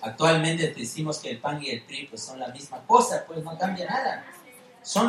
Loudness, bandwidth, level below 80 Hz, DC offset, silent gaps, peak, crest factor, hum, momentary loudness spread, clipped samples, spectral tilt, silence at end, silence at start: -26 LUFS; 15.5 kHz; -70 dBFS; under 0.1%; none; -2 dBFS; 24 dB; none; 16 LU; under 0.1%; -4 dB/octave; 0 s; 0 s